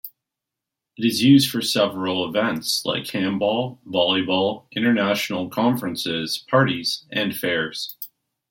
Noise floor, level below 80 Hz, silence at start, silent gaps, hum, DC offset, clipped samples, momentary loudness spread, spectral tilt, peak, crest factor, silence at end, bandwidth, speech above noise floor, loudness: -85 dBFS; -64 dBFS; 0.05 s; none; none; under 0.1%; under 0.1%; 8 LU; -4.5 dB/octave; -4 dBFS; 18 dB; 0.45 s; 16.5 kHz; 64 dB; -21 LUFS